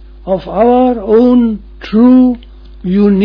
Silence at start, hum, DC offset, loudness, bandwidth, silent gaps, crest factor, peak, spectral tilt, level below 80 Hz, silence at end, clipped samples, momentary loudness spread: 0.2 s; none; under 0.1%; -10 LUFS; 5.4 kHz; none; 10 dB; 0 dBFS; -10 dB/octave; -34 dBFS; 0 s; under 0.1%; 13 LU